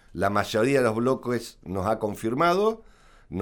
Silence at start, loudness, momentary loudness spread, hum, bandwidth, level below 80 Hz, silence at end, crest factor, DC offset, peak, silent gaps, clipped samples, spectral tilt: 0.15 s; -25 LUFS; 10 LU; none; 19 kHz; -54 dBFS; 0 s; 18 dB; under 0.1%; -8 dBFS; none; under 0.1%; -6 dB/octave